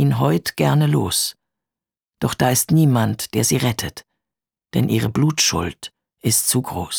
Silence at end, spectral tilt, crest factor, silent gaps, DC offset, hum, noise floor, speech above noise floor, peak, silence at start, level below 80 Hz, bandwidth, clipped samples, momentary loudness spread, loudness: 0 s; -4.5 dB/octave; 16 dB; none; under 0.1%; none; -89 dBFS; 71 dB; -4 dBFS; 0 s; -48 dBFS; over 20 kHz; under 0.1%; 10 LU; -19 LUFS